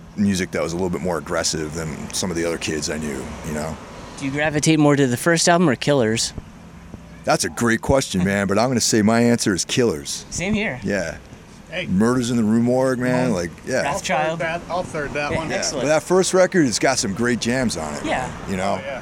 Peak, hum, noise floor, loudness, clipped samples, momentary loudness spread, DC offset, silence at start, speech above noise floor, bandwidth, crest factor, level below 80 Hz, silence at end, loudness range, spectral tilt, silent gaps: -2 dBFS; none; -40 dBFS; -20 LUFS; under 0.1%; 11 LU; under 0.1%; 0 s; 20 dB; 17 kHz; 18 dB; -44 dBFS; 0 s; 4 LU; -4.5 dB/octave; none